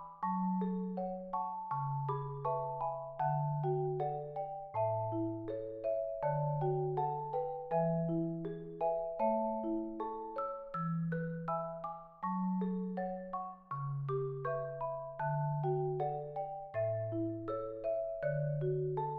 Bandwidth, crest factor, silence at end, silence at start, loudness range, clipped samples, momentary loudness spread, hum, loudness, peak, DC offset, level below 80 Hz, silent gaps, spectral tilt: 4.2 kHz; 16 dB; 0 s; 0 s; 3 LU; under 0.1%; 6 LU; none; -38 LUFS; -22 dBFS; under 0.1%; -64 dBFS; none; -9.5 dB/octave